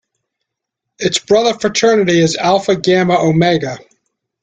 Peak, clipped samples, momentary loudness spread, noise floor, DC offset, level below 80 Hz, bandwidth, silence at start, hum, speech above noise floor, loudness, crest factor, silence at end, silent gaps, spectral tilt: -2 dBFS; under 0.1%; 6 LU; -78 dBFS; under 0.1%; -52 dBFS; 9.4 kHz; 1 s; none; 66 dB; -13 LUFS; 14 dB; 0.65 s; none; -4.5 dB/octave